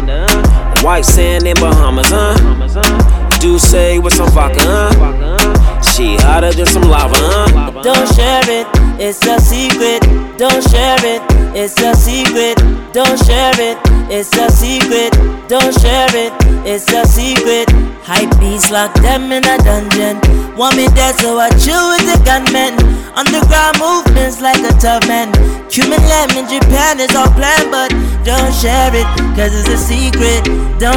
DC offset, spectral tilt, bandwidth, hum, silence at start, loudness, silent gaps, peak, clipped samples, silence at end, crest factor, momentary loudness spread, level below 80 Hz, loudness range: under 0.1%; -4 dB/octave; 18 kHz; none; 0 s; -10 LUFS; none; 0 dBFS; under 0.1%; 0 s; 8 dB; 4 LU; -12 dBFS; 1 LU